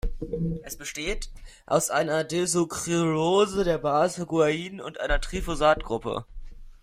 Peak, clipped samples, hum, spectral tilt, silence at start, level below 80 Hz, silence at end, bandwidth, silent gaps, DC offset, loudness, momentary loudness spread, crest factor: -8 dBFS; under 0.1%; none; -4.5 dB/octave; 0.05 s; -38 dBFS; 0.1 s; 16 kHz; none; under 0.1%; -26 LUFS; 11 LU; 18 dB